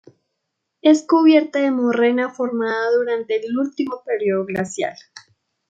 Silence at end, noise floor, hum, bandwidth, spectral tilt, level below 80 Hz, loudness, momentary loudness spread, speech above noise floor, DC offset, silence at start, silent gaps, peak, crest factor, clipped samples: 0.5 s; -77 dBFS; none; 9 kHz; -5 dB/octave; -68 dBFS; -19 LUFS; 10 LU; 59 dB; under 0.1%; 0.85 s; none; -2 dBFS; 18 dB; under 0.1%